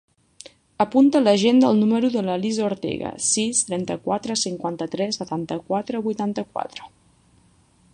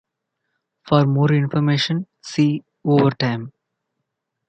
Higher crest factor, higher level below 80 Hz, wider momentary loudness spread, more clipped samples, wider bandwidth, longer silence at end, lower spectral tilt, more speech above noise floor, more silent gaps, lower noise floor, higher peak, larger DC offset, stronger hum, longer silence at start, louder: about the same, 18 dB vs 18 dB; about the same, -60 dBFS vs -60 dBFS; about the same, 12 LU vs 10 LU; neither; first, 11.5 kHz vs 8.4 kHz; about the same, 1.05 s vs 1 s; second, -4 dB/octave vs -7 dB/octave; second, 36 dB vs 60 dB; neither; second, -58 dBFS vs -78 dBFS; about the same, -4 dBFS vs -2 dBFS; neither; neither; about the same, 0.8 s vs 0.85 s; about the same, -21 LUFS vs -19 LUFS